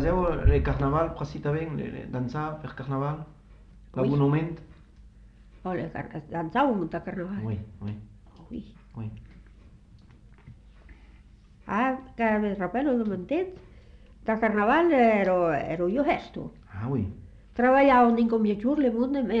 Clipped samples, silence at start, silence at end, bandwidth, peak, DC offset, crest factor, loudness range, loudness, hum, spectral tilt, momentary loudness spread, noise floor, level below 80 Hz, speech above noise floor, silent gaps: under 0.1%; 0 s; 0 s; 7.4 kHz; -8 dBFS; under 0.1%; 20 dB; 14 LU; -26 LUFS; none; -9 dB/octave; 18 LU; -53 dBFS; -40 dBFS; 27 dB; none